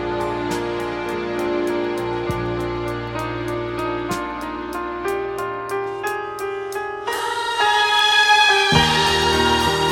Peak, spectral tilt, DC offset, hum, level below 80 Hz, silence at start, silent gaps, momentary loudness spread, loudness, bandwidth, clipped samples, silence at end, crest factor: -2 dBFS; -3.5 dB/octave; under 0.1%; none; -40 dBFS; 0 s; none; 13 LU; -20 LUFS; 17 kHz; under 0.1%; 0 s; 18 dB